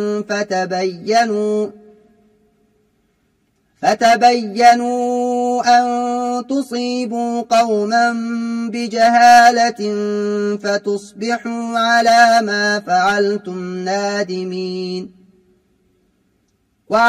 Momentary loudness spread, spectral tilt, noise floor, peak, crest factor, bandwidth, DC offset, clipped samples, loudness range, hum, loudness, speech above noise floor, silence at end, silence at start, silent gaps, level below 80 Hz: 12 LU; -4 dB/octave; -63 dBFS; 0 dBFS; 16 dB; 13.5 kHz; under 0.1%; under 0.1%; 8 LU; none; -16 LUFS; 48 dB; 0 s; 0 s; none; -60 dBFS